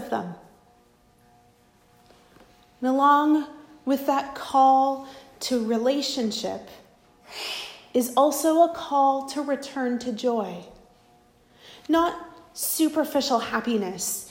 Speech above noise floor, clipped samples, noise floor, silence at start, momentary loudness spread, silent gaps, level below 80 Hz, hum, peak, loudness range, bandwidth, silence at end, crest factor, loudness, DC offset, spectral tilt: 36 dB; under 0.1%; -59 dBFS; 0 s; 16 LU; none; -64 dBFS; none; -8 dBFS; 5 LU; 16 kHz; 0 s; 18 dB; -24 LUFS; under 0.1%; -3.5 dB/octave